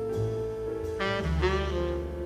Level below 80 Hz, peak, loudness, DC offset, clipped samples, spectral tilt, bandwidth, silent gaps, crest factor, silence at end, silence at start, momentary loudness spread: -36 dBFS; -12 dBFS; -30 LUFS; under 0.1%; under 0.1%; -6.5 dB/octave; 13 kHz; none; 18 dB; 0 s; 0 s; 6 LU